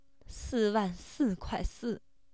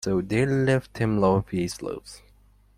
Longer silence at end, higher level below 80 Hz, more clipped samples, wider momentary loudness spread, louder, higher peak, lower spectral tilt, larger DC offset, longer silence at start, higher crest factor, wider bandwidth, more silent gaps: second, 0.35 s vs 0.6 s; about the same, -46 dBFS vs -50 dBFS; neither; about the same, 14 LU vs 13 LU; second, -34 LUFS vs -25 LUFS; second, -18 dBFS vs -8 dBFS; about the same, -6 dB/octave vs -6.5 dB/octave; first, 0.1% vs under 0.1%; first, 0.3 s vs 0 s; about the same, 16 dB vs 18 dB; second, 8 kHz vs 14.5 kHz; neither